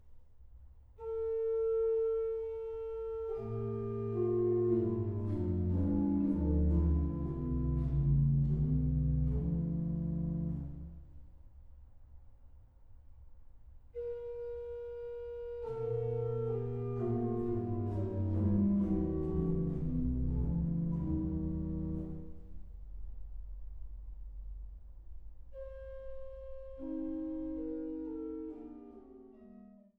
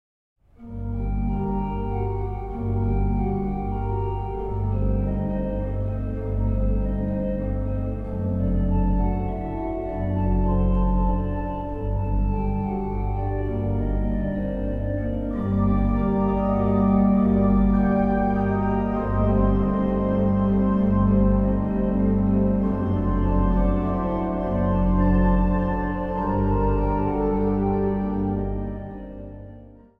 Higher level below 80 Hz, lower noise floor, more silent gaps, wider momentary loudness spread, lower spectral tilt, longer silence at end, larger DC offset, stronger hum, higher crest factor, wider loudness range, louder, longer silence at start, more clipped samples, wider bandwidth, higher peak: second, -42 dBFS vs -28 dBFS; first, -57 dBFS vs -45 dBFS; neither; first, 20 LU vs 9 LU; first, -13 dB/octave vs -11.5 dB/octave; about the same, 0.3 s vs 0.25 s; neither; neither; about the same, 14 dB vs 14 dB; first, 17 LU vs 6 LU; second, -35 LUFS vs -24 LUFS; second, 0.05 s vs 0.6 s; neither; second, 3.3 kHz vs 3.7 kHz; second, -20 dBFS vs -8 dBFS